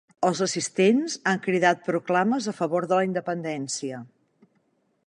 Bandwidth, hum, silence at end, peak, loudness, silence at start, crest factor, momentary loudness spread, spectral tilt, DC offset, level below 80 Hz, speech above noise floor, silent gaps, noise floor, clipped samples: 11 kHz; none; 1 s; -6 dBFS; -24 LUFS; 0.2 s; 20 dB; 9 LU; -4.5 dB/octave; under 0.1%; -74 dBFS; 45 dB; none; -69 dBFS; under 0.1%